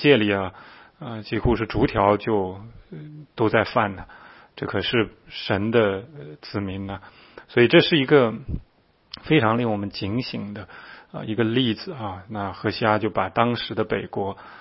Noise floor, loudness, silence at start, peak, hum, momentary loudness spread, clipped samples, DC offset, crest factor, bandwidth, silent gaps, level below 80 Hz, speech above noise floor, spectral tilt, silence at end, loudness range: -45 dBFS; -23 LUFS; 0 s; -2 dBFS; none; 21 LU; under 0.1%; under 0.1%; 22 dB; 5.8 kHz; none; -46 dBFS; 22 dB; -10.5 dB/octave; 0.05 s; 5 LU